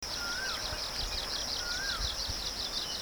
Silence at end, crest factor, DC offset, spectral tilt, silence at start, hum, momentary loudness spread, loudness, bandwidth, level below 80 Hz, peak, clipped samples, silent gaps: 0 s; 16 dB; under 0.1%; -1 dB/octave; 0 s; none; 2 LU; -33 LUFS; over 20 kHz; -46 dBFS; -20 dBFS; under 0.1%; none